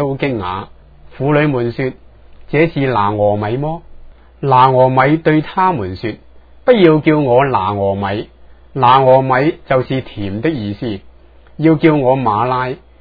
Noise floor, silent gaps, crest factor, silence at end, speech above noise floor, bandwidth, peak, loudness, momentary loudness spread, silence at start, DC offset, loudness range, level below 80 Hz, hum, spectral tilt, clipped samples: -41 dBFS; none; 14 dB; 0.25 s; 28 dB; 5 kHz; 0 dBFS; -14 LUFS; 13 LU; 0 s; under 0.1%; 4 LU; -42 dBFS; none; -10 dB/octave; under 0.1%